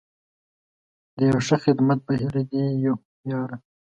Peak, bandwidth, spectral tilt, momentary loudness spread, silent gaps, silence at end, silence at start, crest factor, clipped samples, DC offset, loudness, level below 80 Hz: -6 dBFS; 8.6 kHz; -7 dB/octave; 10 LU; 3.05-3.24 s; 0.35 s; 1.15 s; 18 dB; under 0.1%; under 0.1%; -23 LUFS; -58 dBFS